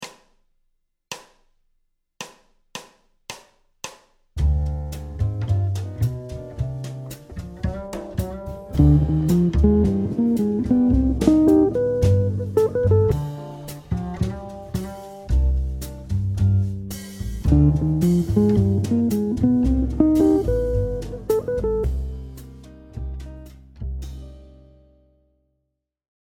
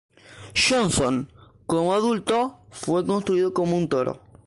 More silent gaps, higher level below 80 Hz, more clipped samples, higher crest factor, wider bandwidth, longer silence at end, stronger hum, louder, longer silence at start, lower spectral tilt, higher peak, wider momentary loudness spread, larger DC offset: neither; first, -30 dBFS vs -52 dBFS; neither; first, 22 dB vs 16 dB; first, 16.5 kHz vs 11.5 kHz; first, 1.75 s vs 0.3 s; neither; about the same, -21 LUFS vs -23 LUFS; second, 0 s vs 0.3 s; first, -8.5 dB/octave vs -4.5 dB/octave; first, 0 dBFS vs -8 dBFS; first, 20 LU vs 10 LU; neither